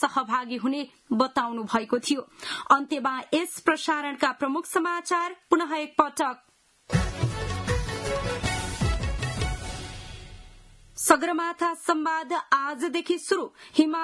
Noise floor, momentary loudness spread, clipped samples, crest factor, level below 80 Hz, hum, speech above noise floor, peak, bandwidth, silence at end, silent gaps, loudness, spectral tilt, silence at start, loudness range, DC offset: -51 dBFS; 8 LU; under 0.1%; 24 dB; -40 dBFS; none; 25 dB; -2 dBFS; 12 kHz; 0 s; none; -26 LUFS; -4.5 dB/octave; 0 s; 4 LU; under 0.1%